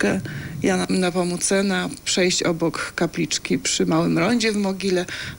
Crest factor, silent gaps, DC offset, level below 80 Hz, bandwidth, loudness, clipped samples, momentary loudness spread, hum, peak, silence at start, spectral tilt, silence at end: 14 dB; none; under 0.1%; -50 dBFS; 17 kHz; -21 LUFS; under 0.1%; 5 LU; none; -6 dBFS; 0 s; -4 dB/octave; 0 s